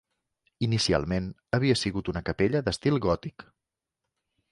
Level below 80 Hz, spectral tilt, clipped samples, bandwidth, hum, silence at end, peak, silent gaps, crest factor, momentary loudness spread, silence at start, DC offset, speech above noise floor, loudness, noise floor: -48 dBFS; -5.5 dB/octave; under 0.1%; 11.5 kHz; none; 1.1 s; -10 dBFS; none; 20 dB; 7 LU; 0.6 s; under 0.1%; 59 dB; -27 LUFS; -86 dBFS